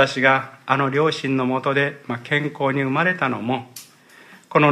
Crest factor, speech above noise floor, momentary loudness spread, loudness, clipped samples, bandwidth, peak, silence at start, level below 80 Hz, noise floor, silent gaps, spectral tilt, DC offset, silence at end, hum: 18 dB; 27 dB; 9 LU; -21 LUFS; under 0.1%; 14.5 kHz; -2 dBFS; 0 s; -70 dBFS; -48 dBFS; none; -6 dB/octave; under 0.1%; 0 s; none